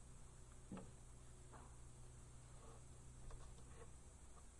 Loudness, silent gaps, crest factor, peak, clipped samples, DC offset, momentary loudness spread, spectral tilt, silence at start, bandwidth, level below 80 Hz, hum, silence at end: -62 LUFS; none; 16 dB; -44 dBFS; under 0.1%; under 0.1%; 6 LU; -5 dB/octave; 0 s; 11.5 kHz; -62 dBFS; none; 0 s